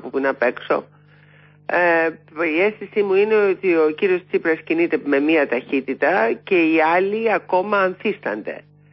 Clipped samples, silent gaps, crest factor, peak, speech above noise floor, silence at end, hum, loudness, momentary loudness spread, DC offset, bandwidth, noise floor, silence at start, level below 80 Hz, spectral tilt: under 0.1%; none; 14 dB; -6 dBFS; 31 dB; 0.35 s; 50 Hz at -50 dBFS; -19 LUFS; 8 LU; under 0.1%; 5.8 kHz; -50 dBFS; 0.05 s; -70 dBFS; -10 dB/octave